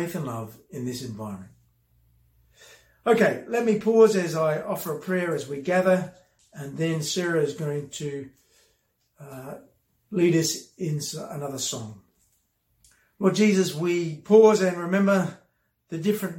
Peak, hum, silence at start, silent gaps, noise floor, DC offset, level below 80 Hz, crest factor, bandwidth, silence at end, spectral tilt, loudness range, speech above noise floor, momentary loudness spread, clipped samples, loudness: -6 dBFS; none; 0 s; none; -70 dBFS; under 0.1%; -68 dBFS; 20 dB; 17 kHz; 0 s; -5.5 dB/octave; 8 LU; 46 dB; 19 LU; under 0.1%; -24 LUFS